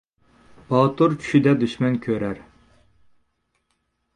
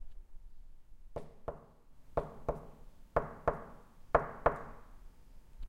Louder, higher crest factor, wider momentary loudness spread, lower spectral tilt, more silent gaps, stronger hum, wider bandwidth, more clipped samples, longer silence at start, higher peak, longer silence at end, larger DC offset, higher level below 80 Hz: first, -21 LUFS vs -38 LUFS; second, 20 dB vs 28 dB; second, 9 LU vs 23 LU; about the same, -8 dB/octave vs -8 dB/octave; neither; neither; second, 10.5 kHz vs 15 kHz; neither; first, 0.7 s vs 0 s; first, -4 dBFS vs -12 dBFS; first, 1.75 s vs 0 s; neither; second, -58 dBFS vs -50 dBFS